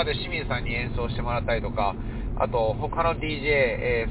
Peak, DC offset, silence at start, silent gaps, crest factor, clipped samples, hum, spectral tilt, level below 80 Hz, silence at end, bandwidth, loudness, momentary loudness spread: -8 dBFS; under 0.1%; 0 s; none; 16 dB; under 0.1%; none; -9.5 dB/octave; -34 dBFS; 0 s; 4 kHz; -26 LUFS; 7 LU